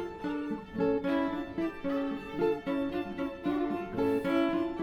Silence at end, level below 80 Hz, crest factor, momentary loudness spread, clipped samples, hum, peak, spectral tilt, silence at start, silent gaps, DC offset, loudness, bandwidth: 0 s; -56 dBFS; 14 dB; 7 LU; under 0.1%; none; -18 dBFS; -7.5 dB/octave; 0 s; none; under 0.1%; -32 LUFS; 13.5 kHz